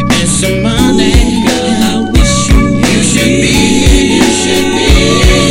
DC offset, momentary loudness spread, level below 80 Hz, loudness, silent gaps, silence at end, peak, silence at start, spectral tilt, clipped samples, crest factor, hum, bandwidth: under 0.1%; 3 LU; -14 dBFS; -8 LUFS; none; 0 s; 0 dBFS; 0 s; -4 dB/octave; 1%; 8 dB; none; 16.5 kHz